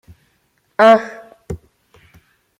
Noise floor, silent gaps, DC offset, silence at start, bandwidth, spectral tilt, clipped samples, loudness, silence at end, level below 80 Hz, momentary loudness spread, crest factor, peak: -63 dBFS; none; under 0.1%; 0.8 s; 10.5 kHz; -5.5 dB/octave; under 0.1%; -12 LUFS; 1.05 s; -48 dBFS; 22 LU; 18 dB; -2 dBFS